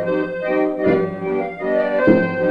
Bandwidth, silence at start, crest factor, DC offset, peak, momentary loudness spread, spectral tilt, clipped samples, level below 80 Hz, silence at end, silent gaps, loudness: 5.6 kHz; 0 s; 16 dB; under 0.1%; -2 dBFS; 7 LU; -9 dB/octave; under 0.1%; -54 dBFS; 0 s; none; -19 LUFS